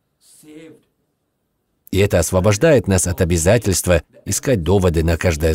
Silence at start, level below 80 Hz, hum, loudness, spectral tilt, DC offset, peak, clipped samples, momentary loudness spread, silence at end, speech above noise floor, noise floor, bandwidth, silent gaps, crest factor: 0.5 s; -32 dBFS; none; -16 LUFS; -5 dB/octave; under 0.1%; -2 dBFS; under 0.1%; 5 LU; 0 s; 54 dB; -70 dBFS; 16.5 kHz; none; 16 dB